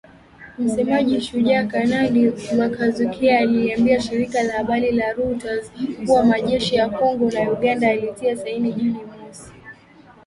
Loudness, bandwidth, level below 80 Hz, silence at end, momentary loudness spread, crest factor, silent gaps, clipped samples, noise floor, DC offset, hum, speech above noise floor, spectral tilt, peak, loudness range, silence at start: -20 LUFS; 11.5 kHz; -50 dBFS; 0.55 s; 9 LU; 16 dB; none; under 0.1%; -48 dBFS; under 0.1%; none; 29 dB; -5.5 dB/octave; -4 dBFS; 2 LU; 0.4 s